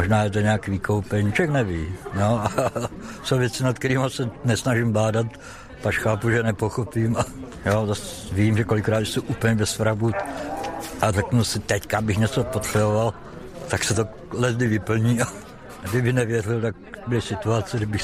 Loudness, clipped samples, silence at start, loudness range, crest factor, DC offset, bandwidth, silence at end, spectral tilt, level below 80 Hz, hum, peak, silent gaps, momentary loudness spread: -23 LUFS; under 0.1%; 0 s; 1 LU; 16 dB; under 0.1%; 15.5 kHz; 0 s; -5.5 dB/octave; -46 dBFS; none; -6 dBFS; none; 8 LU